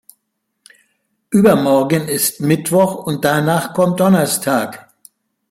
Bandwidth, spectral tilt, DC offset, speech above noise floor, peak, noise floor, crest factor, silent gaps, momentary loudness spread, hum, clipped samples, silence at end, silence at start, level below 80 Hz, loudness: 16.5 kHz; -5 dB/octave; under 0.1%; 58 dB; -2 dBFS; -72 dBFS; 16 dB; none; 6 LU; none; under 0.1%; 0.7 s; 1.3 s; -54 dBFS; -15 LUFS